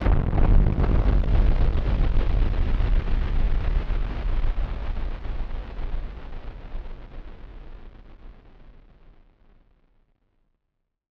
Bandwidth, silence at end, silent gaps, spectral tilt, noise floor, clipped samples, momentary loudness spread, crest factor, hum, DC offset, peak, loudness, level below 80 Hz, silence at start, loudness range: 4.9 kHz; 2.4 s; none; -9 dB/octave; -78 dBFS; under 0.1%; 21 LU; 18 dB; none; under 0.1%; -6 dBFS; -27 LUFS; -24 dBFS; 0 s; 21 LU